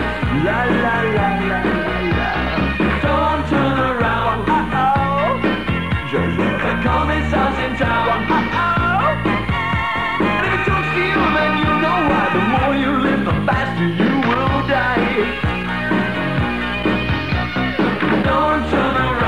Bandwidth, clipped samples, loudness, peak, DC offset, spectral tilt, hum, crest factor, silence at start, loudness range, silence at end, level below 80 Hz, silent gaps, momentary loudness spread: 15.5 kHz; under 0.1%; -17 LUFS; -4 dBFS; 1%; -7 dB/octave; none; 12 dB; 0 s; 2 LU; 0 s; -30 dBFS; none; 4 LU